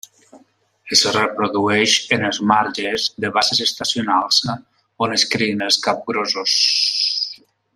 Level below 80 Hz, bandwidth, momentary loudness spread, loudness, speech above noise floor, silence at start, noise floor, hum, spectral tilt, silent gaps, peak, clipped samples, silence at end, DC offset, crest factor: -62 dBFS; 14.5 kHz; 7 LU; -17 LUFS; 37 dB; 0.35 s; -55 dBFS; none; -2 dB/octave; none; -2 dBFS; under 0.1%; 0.4 s; under 0.1%; 18 dB